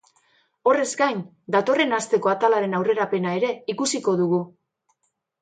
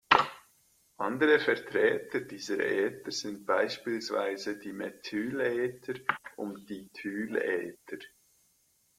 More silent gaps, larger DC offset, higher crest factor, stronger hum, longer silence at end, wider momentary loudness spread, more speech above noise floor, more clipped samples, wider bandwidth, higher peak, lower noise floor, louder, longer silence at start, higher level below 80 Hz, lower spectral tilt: neither; neither; second, 18 dB vs 28 dB; neither; about the same, 0.95 s vs 0.9 s; second, 6 LU vs 15 LU; first, 52 dB vs 38 dB; neither; second, 9.4 kHz vs 16 kHz; about the same, -6 dBFS vs -4 dBFS; first, -74 dBFS vs -70 dBFS; first, -22 LUFS vs -31 LUFS; first, 0.65 s vs 0.1 s; about the same, -74 dBFS vs -70 dBFS; about the same, -4.5 dB/octave vs -4 dB/octave